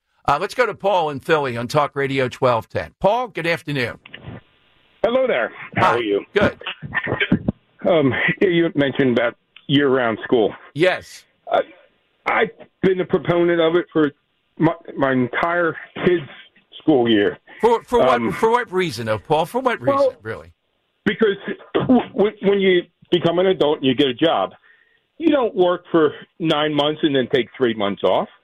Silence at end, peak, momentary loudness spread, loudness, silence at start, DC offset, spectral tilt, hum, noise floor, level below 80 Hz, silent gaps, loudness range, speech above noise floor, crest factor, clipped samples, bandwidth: 0.2 s; -4 dBFS; 7 LU; -19 LUFS; 0.25 s; under 0.1%; -6.5 dB/octave; none; -69 dBFS; -52 dBFS; none; 3 LU; 50 dB; 16 dB; under 0.1%; 14 kHz